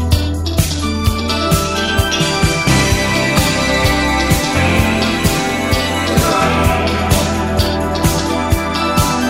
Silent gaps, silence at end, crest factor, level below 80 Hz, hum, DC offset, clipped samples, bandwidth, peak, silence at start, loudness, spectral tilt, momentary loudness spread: none; 0 s; 14 dB; -24 dBFS; none; 0.6%; under 0.1%; 16.5 kHz; 0 dBFS; 0 s; -14 LUFS; -4.5 dB/octave; 4 LU